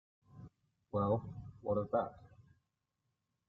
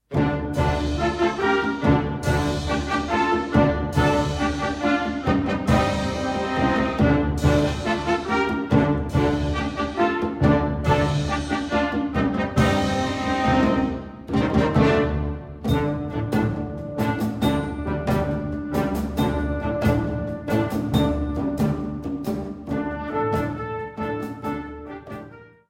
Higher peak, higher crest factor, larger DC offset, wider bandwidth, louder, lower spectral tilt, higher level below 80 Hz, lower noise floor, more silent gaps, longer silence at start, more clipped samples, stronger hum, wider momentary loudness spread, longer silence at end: second, -20 dBFS vs -4 dBFS; about the same, 22 dB vs 18 dB; neither; second, 4.2 kHz vs 16.5 kHz; second, -38 LUFS vs -23 LUFS; first, -9.5 dB/octave vs -6.5 dB/octave; second, -68 dBFS vs -34 dBFS; first, -86 dBFS vs -43 dBFS; neither; first, 0.35 s vs 0.1 s; neither; neither; first, 23 LU vs 9 LU; first, 1.05 s vs 0.25 s